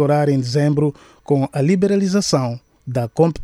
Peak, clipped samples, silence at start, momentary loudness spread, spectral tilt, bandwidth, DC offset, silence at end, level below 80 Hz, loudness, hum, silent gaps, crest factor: -2 dBFS; under 0.1%; 0 s; 8 LU; -6.5 dB/octave; 13 kHz; under 0.1%; 0 s; -52 dBFS; -18 LUFS; none; none; 16 dB